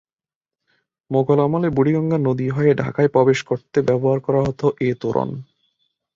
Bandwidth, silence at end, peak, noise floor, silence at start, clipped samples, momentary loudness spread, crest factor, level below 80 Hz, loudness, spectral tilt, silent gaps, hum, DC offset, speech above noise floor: 7.6 kHz; 0.7 s; -2 dBFS; under -90 dBFS; 1.1 s; under 0.1%; 6 LU; 16 dB; -52 dBFS; -19 LUFS; -8 dB/octave; none; none; under 0.1%; over 72 dB